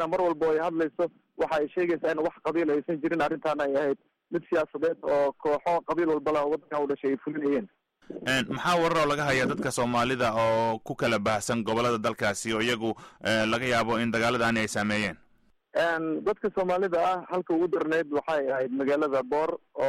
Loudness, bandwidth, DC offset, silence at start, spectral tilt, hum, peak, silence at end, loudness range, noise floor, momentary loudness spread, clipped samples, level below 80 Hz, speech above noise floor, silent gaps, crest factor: -27 LUFS; 15 kHz; under 0.1%; 0 s; -5 dB/octave; none; -16 dBFS; 0 s; 2 LU; -64 dBFS; 5 LU; under 0.1%; -60 dBFS; 37 dB; none; 12 dB